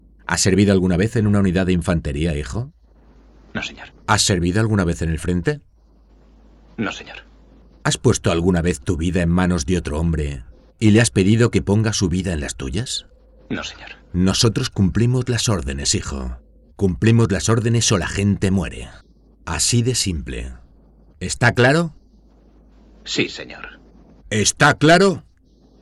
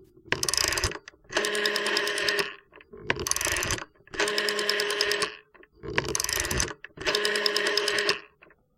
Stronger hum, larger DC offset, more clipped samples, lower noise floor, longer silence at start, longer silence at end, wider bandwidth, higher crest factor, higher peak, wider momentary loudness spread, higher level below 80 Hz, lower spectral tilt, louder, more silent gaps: neither; neither; neither; second, -52 dBFS vs -59 dBFS; first, 0.3 s vs 0 s; about the same, 0.6 s vs 0.5 s; second, 12.5 kHz vs 17 kHz; second, 18 dB vs 24 dB; about the same, -2 dBFS vs -4 dBFS; first, 17 LU vs 8 LU; first, -36 dBFS vs -48 dBFS; first, -5 dB/octave vs -1.5 dB/octave; first, -19 LUFS vs -26 LUFS; neither